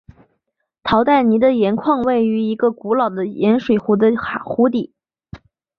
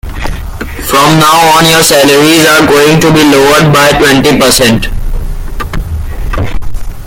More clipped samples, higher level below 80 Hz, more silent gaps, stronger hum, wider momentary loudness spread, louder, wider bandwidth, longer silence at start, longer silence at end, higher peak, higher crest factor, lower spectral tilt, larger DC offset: second, under 0.1% vs 1%; second, -50 dBFS vs -18 dBFS; neither; neither; second, 8 LU vs 16 LU; second, -17 LUFS vs -5 LUFS; second, 5.4 kHz vs over 20 kHz; first, 0.85 s vs 0.05 s; first, 0.4 s vs 0 s; about the same, -2 dBFS vs 0 dBFS; first, 16 dB vs 6 dB; first, -8.5 dB/octave vs -4 dB/octave; neither